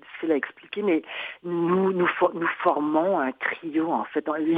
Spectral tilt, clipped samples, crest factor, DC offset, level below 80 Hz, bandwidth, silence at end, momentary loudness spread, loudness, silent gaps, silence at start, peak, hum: -9 dB/octave; under 0.1%; 18 dB; under 0.1%; -74 dBFS; 4.5 kHz; 0 s; 6 LU; -25 LUFS; none; 0.1 s; -6 dBFS; none